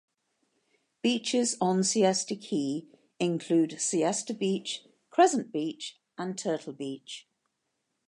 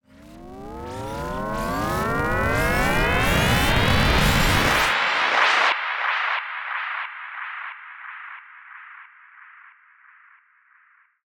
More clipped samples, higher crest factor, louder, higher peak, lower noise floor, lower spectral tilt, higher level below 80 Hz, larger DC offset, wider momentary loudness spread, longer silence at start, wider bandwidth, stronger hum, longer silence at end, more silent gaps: neither; about the same, 22 dB vs 20 dB; second, -29 LUFS vs -21 LUFS; second, -8 dBFS vs -4 dBFS; first, -80 dBFS vs -59 dBFS; about the same, -4 dB/octave vs -4 dB/octave; second, -82 dBFS vs -34 dBFS; neither; second, 14 LU vs 20 LU; first, 1.05 s vs 0.2 s; second, 11.5 kHz vs 17 kHz; neither; second, 0.9 s vs 1.65 s; neither